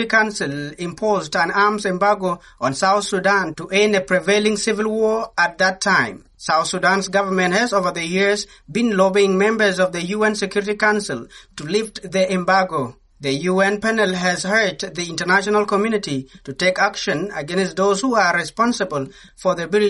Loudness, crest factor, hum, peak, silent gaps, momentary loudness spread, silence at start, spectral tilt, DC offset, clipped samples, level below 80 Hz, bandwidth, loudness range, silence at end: -19 LUFS; 16 dB; none; -2 dBFS; none; 9 LU; 0 s; -4 dB/octave; under 0.1%; under 0.1%; -54 dBFS; 11.5 kHz; 2 LU; 0 s